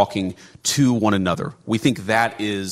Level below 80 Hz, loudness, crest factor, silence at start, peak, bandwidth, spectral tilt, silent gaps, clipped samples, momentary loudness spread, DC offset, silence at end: -56 dBFS; -21 LUFS; 18 dB; 0 s; -2 dBFS; 16 kHz; -4.5 dB/octave; none; under 0.1%; 9 LU; under 0.1%; 0 s